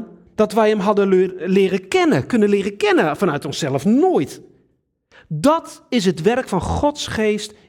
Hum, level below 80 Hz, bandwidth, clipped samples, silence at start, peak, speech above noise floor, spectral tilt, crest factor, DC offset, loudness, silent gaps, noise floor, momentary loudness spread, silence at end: none; -46 dBFS; 16 kHz; under 0.1%; 0 s; -4 dBFS; 47 dB; -5.5 dB/octave; 16 dB; under 0.1%; -18 LUFS; none; -64 dBFS; 6 LU; 0.15 s